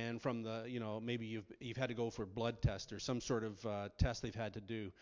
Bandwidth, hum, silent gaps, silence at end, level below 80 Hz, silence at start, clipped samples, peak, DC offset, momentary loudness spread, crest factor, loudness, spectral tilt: 7.6 kHz; none; none; 0.1 s; -52 dBFS; 0 s; under 0.1%; -20 dBFS; under 0.1%; 7 LU; 20 dB; -42 LUFS; -6 dB/octave